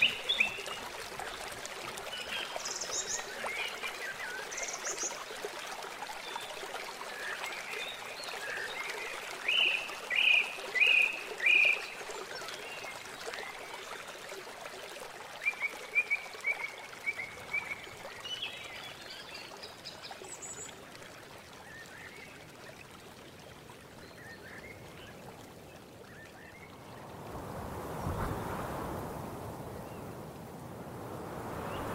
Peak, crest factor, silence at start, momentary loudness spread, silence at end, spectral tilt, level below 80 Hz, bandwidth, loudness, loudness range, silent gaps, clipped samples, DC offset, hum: -14 dBFS; 24 dB; 0 s; 22 LU; 0 s; -1.5 dB/octave; -60 dBFS; 16 kHz; -34 LUFS; 21 LU; none; under 0.1%; under 0.1%; none